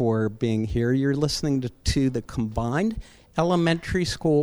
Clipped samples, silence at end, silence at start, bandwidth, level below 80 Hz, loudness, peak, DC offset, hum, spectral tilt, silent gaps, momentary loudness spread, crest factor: under 0.1%; 0 s; 0 s; over 20 kHz; -40 dBFS; -25 LUFS; -8 dBFS; under 0.1%; none; -6 dB/octave; none; 6 LU; 16 dB